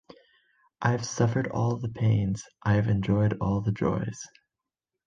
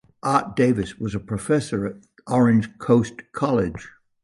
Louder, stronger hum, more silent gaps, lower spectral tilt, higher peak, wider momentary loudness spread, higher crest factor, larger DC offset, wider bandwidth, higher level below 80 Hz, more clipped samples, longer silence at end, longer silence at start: second, -27 LUFS vs -22 LUFS; neither; neither; about the same, -7 dB/octave vs -7 dB/octave; about the same, -8 dBFS vs -6 dBFS; second, 7 LU vs 11 LU; about the same, 20 dB vs 16 dB; neither; second, 7.6 kHz vs 11.5 kHz; about the same, -50 dBFS vs -48 dBFS; neither; first, 0.8 s vs 0.35 s; first, 0.8 s vs 0.25 s